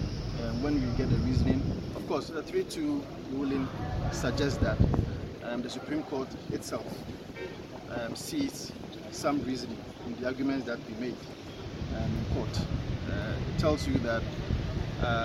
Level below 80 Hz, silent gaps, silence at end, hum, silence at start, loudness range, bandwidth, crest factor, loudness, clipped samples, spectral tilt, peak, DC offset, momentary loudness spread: -42 dBFS; none; 0 s; none; 0 s; 5 LU; 15.5 kHz; 22 dB; -33 LUFS; under 0.1%; -6.5 dB/octave; -10 dBFS; under 0.1%; 12 LU